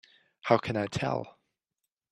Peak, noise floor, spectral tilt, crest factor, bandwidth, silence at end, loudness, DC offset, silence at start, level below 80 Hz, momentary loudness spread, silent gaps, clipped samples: -8 dBFS; -87 dBFS; -6 dB/octave; 24 dB; 12 kHz; 0.8 s; -30 LUFS; under 0.1%; 0.45 s; -64 dBFS; 13 LU; none; under 0.1%